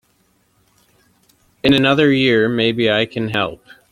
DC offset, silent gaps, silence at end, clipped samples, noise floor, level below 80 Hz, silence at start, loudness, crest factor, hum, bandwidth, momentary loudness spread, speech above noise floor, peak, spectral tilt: under 0.1%; none; 0.35 s; under 0.1%; -60 dBFS; -50 dBFS; 1.65 s; -16 LUFS; 18 dB; none; 13 kHz; 7 LU; 45 dB; 0 dBFS; -6.5 dB/octave